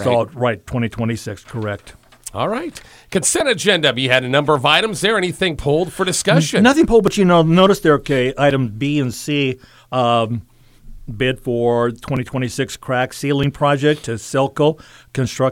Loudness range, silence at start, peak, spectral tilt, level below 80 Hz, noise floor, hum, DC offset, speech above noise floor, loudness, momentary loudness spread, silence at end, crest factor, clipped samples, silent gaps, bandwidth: 6 LU; 0 s; 0 dBFS; -4.5 dB/octave; -42 dBFS; -38 dBFS; none; under 0.1%; 21 dB; -17 LUFS; 13 LU; 0 s; 18 dB; under 0.1%; none; 16.5 kHz